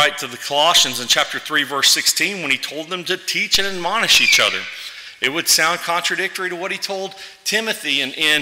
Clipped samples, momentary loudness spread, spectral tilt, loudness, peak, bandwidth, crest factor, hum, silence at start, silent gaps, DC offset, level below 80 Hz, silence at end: under 0.1%; 13 LU; 0 dB/octave; -16 LUFS; -4 dBFS; 16.5 kHz; 16 dB; none; 0 s; none; under 0.1%; -56 dBFS; 0 s